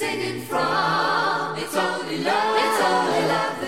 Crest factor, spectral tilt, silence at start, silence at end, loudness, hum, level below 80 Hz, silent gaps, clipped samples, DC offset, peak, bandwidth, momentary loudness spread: 14 dB; -3.5 dB/octave; 0 s; 0 s; -22 LUFS; none; -62 dBFS; none; under 0.1%; 0.3%; -8 dBFS; 16 kHz; 6 LU